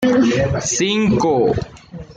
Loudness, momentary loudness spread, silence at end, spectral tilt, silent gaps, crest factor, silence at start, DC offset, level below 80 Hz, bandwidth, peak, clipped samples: -17 LUFS; 12 LU; 0.05 s; -4.5 dB/octave; none; 12 dB; 0 s; under 0.1%; -40 dBFS; 9.8 kHz; -6 dBFS; under 0.1%